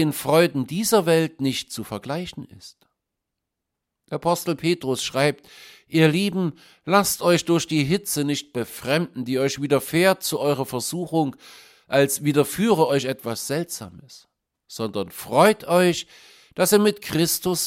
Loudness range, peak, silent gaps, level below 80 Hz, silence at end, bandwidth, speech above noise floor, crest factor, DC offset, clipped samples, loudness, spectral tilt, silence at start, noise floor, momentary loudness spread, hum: 5 LU; -2 dBFS; none; -60 dBFS; 0 s; 16.5 kHz; 60 dB; 20 dB; under 0.1%; under 0.1%; -22 LUFS; -4.5 dB/octave; 0 s; -82 dBFS; 12 LU; none